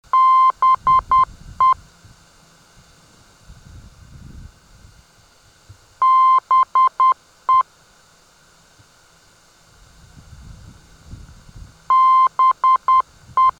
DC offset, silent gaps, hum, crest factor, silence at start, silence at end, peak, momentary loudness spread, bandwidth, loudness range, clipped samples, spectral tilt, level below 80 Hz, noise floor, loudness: under 0.1%; none; none; 12 dB; 0.15 s; 0.1 s; -8 dBFS; 6 LU; 9.2 kHz; 8 LU; under 0.1%; -3.5 dB/octave; -48 dBFS; -52 dBFS; -15 LUFS